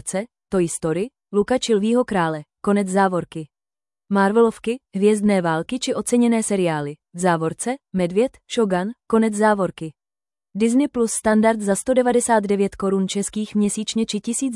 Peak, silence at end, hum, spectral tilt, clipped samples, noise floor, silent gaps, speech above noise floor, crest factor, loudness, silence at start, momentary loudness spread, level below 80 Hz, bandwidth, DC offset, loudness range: -6 dBFS; 0 s; none; -5 dB/octave; under 0.1%; under -90 dBFS; none; over 70 dB; 16 dB; -20 LUFS; 0.05 s; 9 LU; -54 dBFS; 12 kHz; under 0.1%; 2 LU